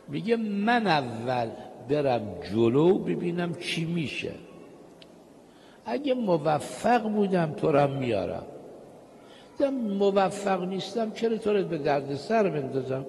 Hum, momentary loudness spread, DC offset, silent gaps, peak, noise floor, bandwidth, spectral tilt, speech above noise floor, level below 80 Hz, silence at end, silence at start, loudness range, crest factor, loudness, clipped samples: none; 10 LU; under 0.1%; none; -10 dBFS; -52 dBFS; 12 kHz; -6.5 dB/octave; 26 dB; -64 dBFS; 0 s; 0.05 s; 5 LU; 16 dB; -27 LUFS; under 0.1%